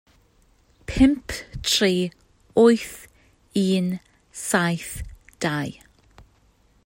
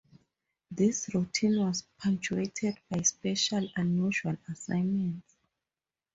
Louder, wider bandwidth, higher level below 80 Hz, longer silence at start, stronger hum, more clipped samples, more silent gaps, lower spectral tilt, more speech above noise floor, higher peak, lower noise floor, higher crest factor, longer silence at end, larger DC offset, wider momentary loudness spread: first, -22 LUFS vs -30 LUFS; first, 16.5 kHz vs 8 kHz; first, -42 dBFS vs -66 dBFS; first, 0.9 s vs 0.7 s; neither; neither; neither; about the same, -4.5 dB/octave vs -4.5 dB/octave; second, 39 dB vs over 60 dB; first, -4 dBFS vs -14 dBFS; second, -60 dBFS vs under -90 dBFS; about the same, 20 dB vs 18 dB; first, 1.15 s vs 0.95 s; neither; first, 18 LU vs 7 LU